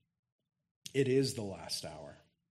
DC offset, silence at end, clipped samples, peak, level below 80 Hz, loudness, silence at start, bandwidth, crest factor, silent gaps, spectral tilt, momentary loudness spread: under 0.1%; 0.35 s; under 0.1%; -18 dBFS; -70 dBFS; -35 LUFS; 0.85 s; 13 kHz; 20 dB; none; -5 dB/octave; 20 LU